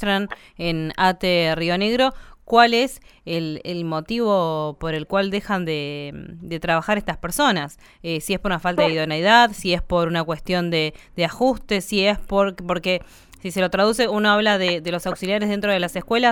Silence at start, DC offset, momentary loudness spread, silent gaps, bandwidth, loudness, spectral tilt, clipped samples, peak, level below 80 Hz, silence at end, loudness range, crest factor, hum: 0 s; under 0.1%; 11 LU; none; 19 kHz; -21 LUFS; -4.5 dB/octave; under 0.1%; 0 dBFS; -42 dBFS; 0 s; 4 LU; 20 dB; none